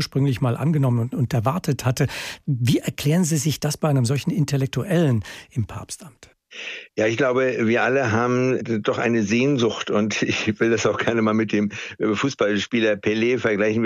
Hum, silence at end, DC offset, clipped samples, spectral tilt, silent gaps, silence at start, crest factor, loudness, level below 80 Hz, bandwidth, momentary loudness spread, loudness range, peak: none; 0 s; under 0.1%; under 0.1%; -5.5 dB/octave; none; 0 s; 14 dB; -21 LUFS; -56 dBFS; 15.5 kHz; 9 LU; 3 LU; -8 dBFS